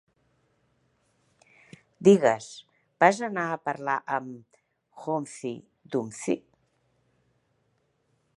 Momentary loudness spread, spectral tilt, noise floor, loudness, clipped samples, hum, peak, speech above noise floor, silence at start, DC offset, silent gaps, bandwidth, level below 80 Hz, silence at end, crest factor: 22 LU; -5.5 dB/octave; -72 dBFS; -26 LUFS; under 0.1%; none; -4 dBFS; 46 dB; 2 s; under 0.1%; none; 11.5 kHz; -74 dBFS; 2 s; 26 dB